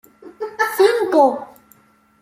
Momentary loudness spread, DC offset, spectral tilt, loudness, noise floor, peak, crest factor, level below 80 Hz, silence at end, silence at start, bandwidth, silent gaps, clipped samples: 16 LU; under 0.1%; -3 dB/octave; -16 LUFS; -54 dBFS; -2 dBFS; 16 dB; -68 dBFS; 0.75 s; 0.25 s; 16 kHz; none; under 0.1%